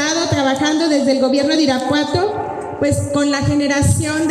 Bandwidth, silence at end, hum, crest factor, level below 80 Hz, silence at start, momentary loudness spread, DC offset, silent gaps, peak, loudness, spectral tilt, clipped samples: 13 kHz; 0 s; none; 12 dB; -40 dBFS; 0 s; 4 LU; under 0.1%; none; -4 dBFS; -16 LUFS; -4.5 dB/octave; under 0.1%